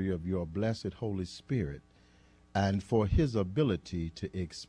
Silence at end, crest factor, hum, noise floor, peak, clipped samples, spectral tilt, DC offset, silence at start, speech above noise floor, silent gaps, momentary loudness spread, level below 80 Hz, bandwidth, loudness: 0.05 s; 16 dB; none; -62 dBFS; -16 dBFS; under 0.1%; -7.5 dB/octave; under 0.1%; 0 s; 30 dB; none; 9 LU; -44 dBFS; 10.5 kHz; -33 LUFS